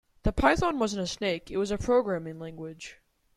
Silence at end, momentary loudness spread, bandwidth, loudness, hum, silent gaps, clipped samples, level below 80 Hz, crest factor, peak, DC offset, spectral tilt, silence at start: 0.45 s; 16 LU; 13.5 kHz; -28 LUFS; none; none; under 0.1%; -42 dBFS; 22 dB; -8 dBFS; under 0.1%; -5 dB/octave; 0.25 s